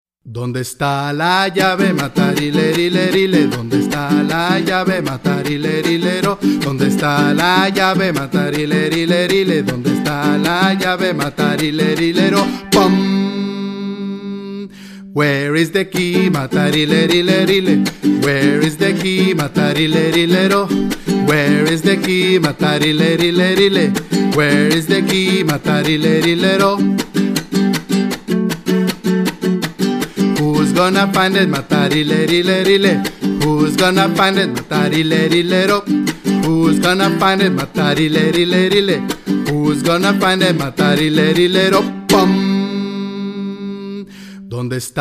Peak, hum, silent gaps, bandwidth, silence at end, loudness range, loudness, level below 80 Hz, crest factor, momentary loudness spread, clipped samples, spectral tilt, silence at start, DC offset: 0 dBFS; none; none; 15.5 kHz; 0 s; 3 LU; -14 LUFS; -46 dBFS; 14 dB; 7 LU; under 0.1%; -5.5 dB/octave; 0.25 s; under 0.1%